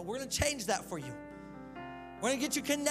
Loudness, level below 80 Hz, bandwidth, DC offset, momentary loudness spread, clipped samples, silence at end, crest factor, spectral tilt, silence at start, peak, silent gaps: -34 LUFS; -54 dBFS; 16 kHz; under 0.1%; 16 LU; under 0.1%; 0 s; 22 dB; -3 dB/octave; 0 s; -14 dBFS; none